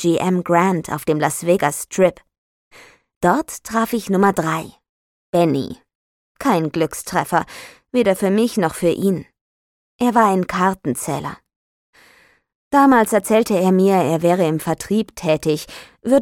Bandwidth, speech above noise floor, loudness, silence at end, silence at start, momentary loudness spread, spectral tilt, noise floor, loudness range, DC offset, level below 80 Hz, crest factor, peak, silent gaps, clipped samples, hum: 17.5 kHz; 36 dB; -18 LUFS; 0 s; 0 s; 9 LU; -5.5 dB/octave; -53 dBFS; 5 LU; under 0.1%; -54 dBFS; 16 dB; -2 dBFS; 2.38-2.71 s, 3.16-3.21 s, 4.89-5.33 s, 5.95-6.35 s, 9.41-9.99 s, 11.56-11.93 s, 12.55-12.71 s; under 0.1%; none